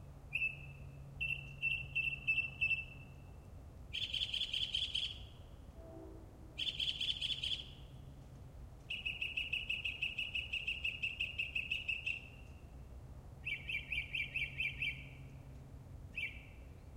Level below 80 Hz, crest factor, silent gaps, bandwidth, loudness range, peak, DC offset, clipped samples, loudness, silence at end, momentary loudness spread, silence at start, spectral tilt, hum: -56 dBFS; 20 dB; none; 16.5 kHz; 4 LU; -22 dBFS; under 0.1%; under 0.1%; -38 LUFS; 0 s; 20 LU; 0 s; -2.5 dB/octave; none